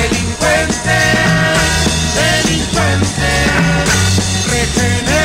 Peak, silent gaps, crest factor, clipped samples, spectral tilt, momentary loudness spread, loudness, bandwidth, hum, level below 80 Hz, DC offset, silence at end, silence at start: -4 dBFS; none; 8 dB; under 0.1%; -3.5 dB/octave; 3 LU; -12 LUFS; 16.5 kHz; none; -24 dBFS; under 0.1%; 0 s; 0 s